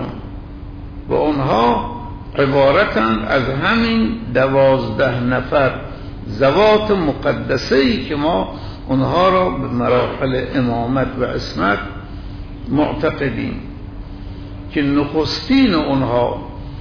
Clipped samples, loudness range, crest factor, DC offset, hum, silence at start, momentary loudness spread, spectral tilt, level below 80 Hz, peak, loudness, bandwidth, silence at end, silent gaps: under 0.1%; 5 LU; 14 dB; under 0.1%; none; 0 s; 18 LU; -7 dB/octave; -34 dBFS; -4 dBFS; -17 LUFS; 5.4 kHz; 0 s; none